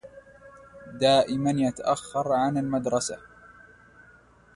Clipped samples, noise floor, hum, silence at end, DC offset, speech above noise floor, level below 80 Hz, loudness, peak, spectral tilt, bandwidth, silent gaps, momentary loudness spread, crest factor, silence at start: under 0.1%; -56 dBFS; none; 1.35 s; under 0.1%; 31 dB; -60 dBFS; -25 LUFS; -8 dBFS; -5 dB/octave; 11.5 kHz; none; 15 LU; 18 dB; 0.05 s